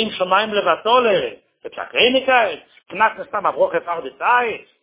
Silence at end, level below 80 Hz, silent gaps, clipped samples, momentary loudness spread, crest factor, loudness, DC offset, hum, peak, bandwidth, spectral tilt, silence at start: 0.2 s; -60 dBFS; none; under 0.1%; 15 LU; 18 dB; -18 LUFS; under 0.1%; none; 0 dBFS; 4 kHz; -7 dB/octave; 0 s